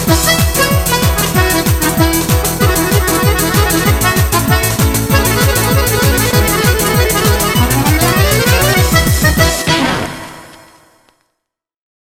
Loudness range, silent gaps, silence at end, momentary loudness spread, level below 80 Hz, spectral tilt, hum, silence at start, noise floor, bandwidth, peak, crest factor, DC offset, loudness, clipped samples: 2 LU; none; 1.65 s; 2 LU; -20 dBFS; -4 dB/octave; none; 0 s; -76 dBFS; 18 kHz; 0 dBFS; 12 dB; under 0.1%; -11 LUFS; under 0.1%